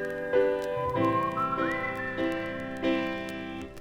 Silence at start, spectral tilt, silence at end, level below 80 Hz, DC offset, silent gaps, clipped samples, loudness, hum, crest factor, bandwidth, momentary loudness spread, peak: 0 s; -6.5 dB/octave; 0 s; -56 dBFS; under 0.1%; none; under 0.1%; -29 LUFS; none; 16 dB; 16.5 kHz; 8 LU; -14 dBFS